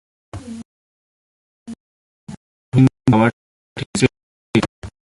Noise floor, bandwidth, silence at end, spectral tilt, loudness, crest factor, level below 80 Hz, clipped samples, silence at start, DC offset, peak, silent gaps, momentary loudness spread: under -90 dBFS; 11.5 kHz; 0.3 s; -6.5 dB/octave; -18 LUFS; 20 dB; -46 dBFS; under 0.1%; 0.35 s; under 0.1%; 0 dBFS; 0.65-1.66 s, 1.80-2.27 s, 2.37-2.72 s, 3.33-3.76 s, 3.86-3.94 s, 4.23-4.54 s, 4.69-4.82 s; 24 LU